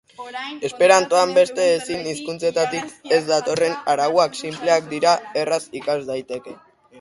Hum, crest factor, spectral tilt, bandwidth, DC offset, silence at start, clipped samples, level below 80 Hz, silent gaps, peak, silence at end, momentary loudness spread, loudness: none; 20 dB; -3 dB/octave; 11.5 kHz; under 0.1%; 0.2 s; under 0.1%; -64 dBFS; none; -2 dBFS; 0 s; 13 LU; -20 LUFS